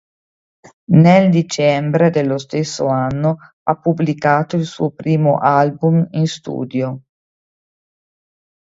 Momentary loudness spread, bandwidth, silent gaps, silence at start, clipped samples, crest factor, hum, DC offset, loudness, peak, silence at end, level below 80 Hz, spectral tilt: 10 LU; 7.8 kHz; 3.53-3.66 s; 0.9 s; under 0.1%; 16 dB; none; under 0.1%; -16 LUFS; 0 dBFS; 1.75 s; -56 dBFS; -7 dB/octave